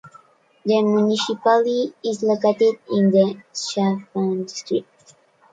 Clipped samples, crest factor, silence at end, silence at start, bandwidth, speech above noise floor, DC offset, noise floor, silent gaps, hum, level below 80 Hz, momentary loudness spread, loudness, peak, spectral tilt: under 0.1%; 16 dB; 0.7 s; 0.05 s; 9.2 kHz; 35 dB; under 0.1%; -54 dBFS; none; none; -68 dBFS; 9 LU; -20 LUFS; -4 dBFS; -5.5 dB/octave